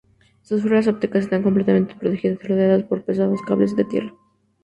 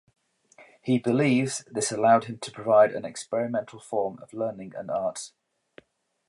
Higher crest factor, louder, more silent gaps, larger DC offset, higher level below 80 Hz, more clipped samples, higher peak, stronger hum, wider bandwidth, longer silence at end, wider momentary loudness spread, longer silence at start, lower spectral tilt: about the same, 16 dB vs 18 dB; first, -20 LUFS vs -26 LUFS; neither; neither; first, -58 dBFS vs -72 dBFS; neither; first, -4 dBFS vs -8 dBFS; neither; second, 8.4 kHz vs 11.5 kHz; second, 0.55 s vs 1 s; second, 6 LU vs 15 LU; second, 0.5 s vs 0.85 s; first, -9 dB/octave vs -5 dB/octave